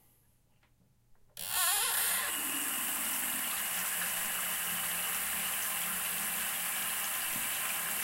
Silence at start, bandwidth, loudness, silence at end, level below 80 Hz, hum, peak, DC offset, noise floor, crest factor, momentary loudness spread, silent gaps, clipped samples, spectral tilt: 1.1 s; 16 kHz; -31 LUFS; 0 s; -68 dBFS; none; -18 dBFS; under 0.1%; -68 dBFS; 18 dB; 4 LU; none; under 0.1%; 1 dB/octave